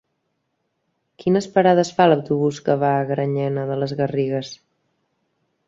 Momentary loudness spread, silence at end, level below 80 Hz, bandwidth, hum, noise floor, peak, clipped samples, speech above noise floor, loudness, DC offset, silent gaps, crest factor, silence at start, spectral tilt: 8 LU; 1.1 s; -62 dBFS; 7.8 kHz; none; -73 dBFS; -2 dBFS; under 0.1%; 54 dB; -20 LUFS; under 0.1%; none; 20 dB; 1.2 s; -6.5 dB/octave